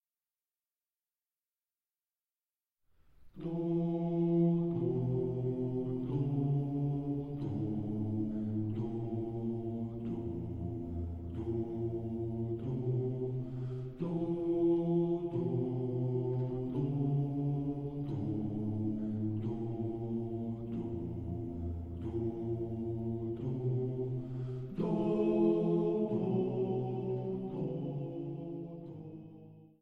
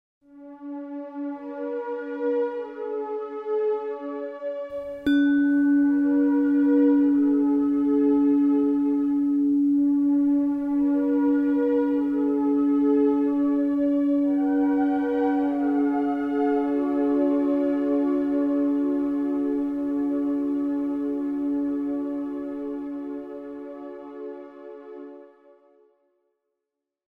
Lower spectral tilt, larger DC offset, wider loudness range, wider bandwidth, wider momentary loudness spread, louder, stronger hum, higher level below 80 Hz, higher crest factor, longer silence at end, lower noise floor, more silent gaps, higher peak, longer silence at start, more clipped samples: first, -11.5 dB/octave vs -7.5 dB/octave; neither; second, 6 LU vs 11 LU; first, 4.2 kHz vs 3.7 kHz; second, 9 LU vs 15 LU; second, -36 LUFS vs -23 LUFS; neither; about the same, -56 dBFS vs -60 dBFS; about the same, 16 dB vs 12 dB; second, 0.15 s vs 1.85 s; first, under -90 dBFS vs -85 dBFS; neither; second, -20 dBFS vs -12 dBFS; first, 3.2 s vs 0.35 s; neither